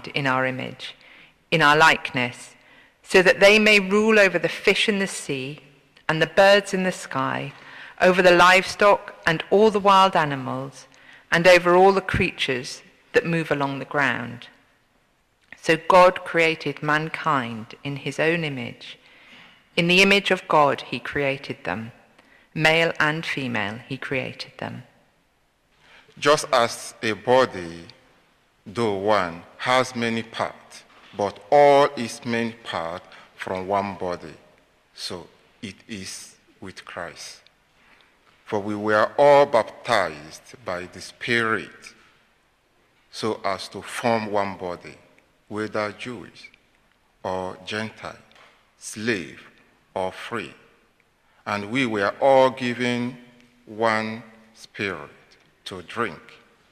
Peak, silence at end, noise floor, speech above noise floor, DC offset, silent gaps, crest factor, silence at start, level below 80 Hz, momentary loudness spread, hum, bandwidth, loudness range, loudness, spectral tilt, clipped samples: -6 dBFS; 0.5 s; -65 dBFS; 43 dB; under 0.1%; none; 18 dB; 0.05 s; -56 dBFS; 21 LU; none; 15 kHz; 14 LU; -21 LUFS; -4.5 dB/octave; under 0.1%